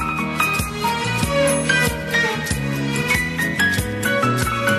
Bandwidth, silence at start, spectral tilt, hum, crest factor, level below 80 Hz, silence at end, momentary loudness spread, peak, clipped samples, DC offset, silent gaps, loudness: 13 kHz; 0 s; -4 dB/octave; none; 16 dB; -36 dBFS; 0 s; 4 LU; -4 dBFS; under 0.1%; under 0.1%; none; -19 LUFS